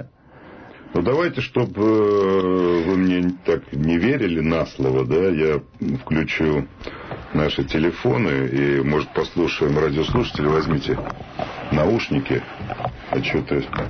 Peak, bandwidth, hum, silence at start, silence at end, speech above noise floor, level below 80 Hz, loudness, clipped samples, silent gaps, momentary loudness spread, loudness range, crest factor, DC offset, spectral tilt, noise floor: -8 dBFS; 6.6 kHz; none; 0 s; 0 s; 24 dB; -40 dBFS; -21 LUFS; under 0.1%; none; 8 LU; 3 LU; 12 dB; under 0.1%; -7.5 dB/octave; -45 dBFS